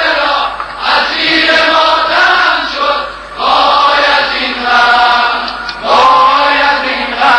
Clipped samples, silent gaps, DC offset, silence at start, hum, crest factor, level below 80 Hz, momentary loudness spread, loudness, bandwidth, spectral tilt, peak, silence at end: under 0.1%; none; under 0.1%; 0 s; none; 10 dB; -40 dBFS; 9 LU; -9 LUFS; 11 kHz; -2 dB/octave; 0 dBFS; 0 s